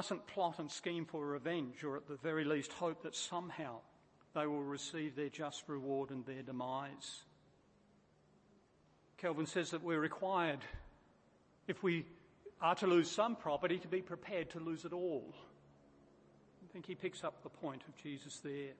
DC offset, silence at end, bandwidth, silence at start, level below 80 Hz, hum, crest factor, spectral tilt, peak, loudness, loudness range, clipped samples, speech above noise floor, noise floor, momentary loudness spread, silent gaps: under 0.1%; 0 s; 8.4 kHz; 0 s; -72 dBFS; none; 22 dB; -5 dB/octave; -20 dBFS; -41 LUFS; 9 LU; under 0.1%; 30 dB; -71 dBFS; 13 LU; none